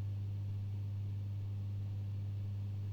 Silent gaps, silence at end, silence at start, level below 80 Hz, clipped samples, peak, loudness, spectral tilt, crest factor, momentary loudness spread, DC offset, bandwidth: none; 0 s; 0 s; -64 dBFS; under 0.1%; -34 dBFS; -42 LUFS; -9 dB/octave; 6 dB; 0 LU; under 0.1%; 4.8 kHz